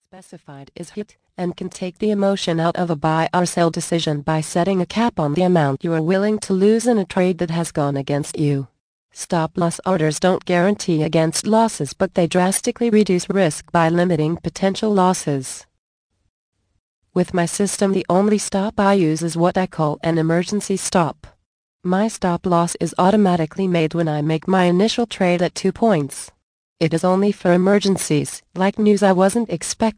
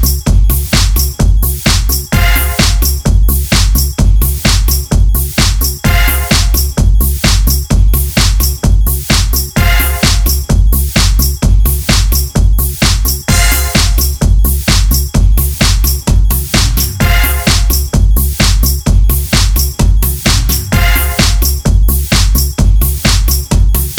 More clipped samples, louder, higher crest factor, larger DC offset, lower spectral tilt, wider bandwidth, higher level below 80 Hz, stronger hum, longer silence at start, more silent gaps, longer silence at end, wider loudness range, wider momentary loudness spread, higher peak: neither; second, -19 LUFS vs -11 LUFS; first, 16 dB vs 8 dB; neither; first, -5.5 dB/octave vs -4 dB/octave; second, 10.5 kHz vs over 20 kHz; second, -52 dBFS vs -10 dBFS; neither; first, 0.15 s vs 0 s; first, 8.80-9.09 s, 15.78-16.10 s, 16.29-16.52 s, 16.79-17.02 s, 21.46-21.79 s, 26.43-26.76 s vs none; about the same, 0.05 s vs 0 s; first, 3 LU vs 0 LU; first, 7 LU vs 2 LU; about the same, -2 dBFS vs 0 dBFS